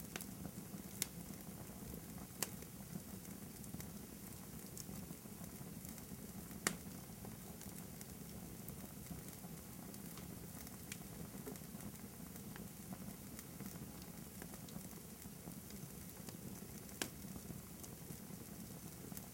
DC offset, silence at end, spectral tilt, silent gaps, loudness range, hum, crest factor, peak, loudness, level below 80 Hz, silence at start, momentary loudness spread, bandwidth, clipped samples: under 0.1%; 0 s; -4 dB/octave; none; 3 LU; none; 36 dB; -14 dBFS; -50 LUFS; -66 dBFS; 0 s; 7 LU; 17 kHz; under 0.1%